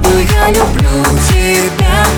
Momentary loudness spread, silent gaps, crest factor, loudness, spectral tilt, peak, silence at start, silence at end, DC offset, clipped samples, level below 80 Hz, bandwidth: 2 LU; none; 10 dB; -10 LUFS; -4.5 dB/octave; 0 dBFS; 0 s; 0 s; under 0.1%; under 0.1%; -14 dBFS; over 20 kHz